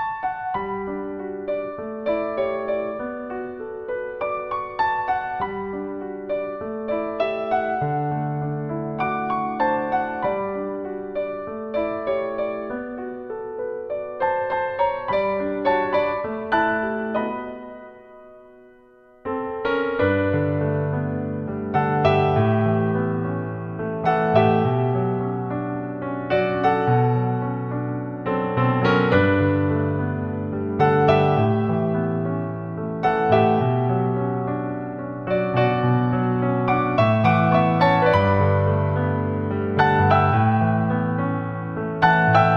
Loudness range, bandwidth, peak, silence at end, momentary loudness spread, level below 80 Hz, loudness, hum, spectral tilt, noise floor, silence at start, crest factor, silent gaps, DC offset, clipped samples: 8 LU; 6.6 kHz; -2 dBFS; 0 s; 12 LU; -52 dBFS; -22 LUFS; none; -9.5 dB/octave; -51 dBFS; 0 s; 18 dB; none; under 0.1%; under 0.1%